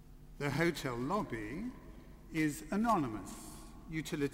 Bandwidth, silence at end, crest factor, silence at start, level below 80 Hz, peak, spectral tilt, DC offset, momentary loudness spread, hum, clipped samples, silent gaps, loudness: 16 kHz; 0 s; 18 dB; 0 s; -54 dBFS; -18 dBFS; -5.5 dB/octave; under 0.1%; 18 LU; none; under 0.1%; none; -37 LUFS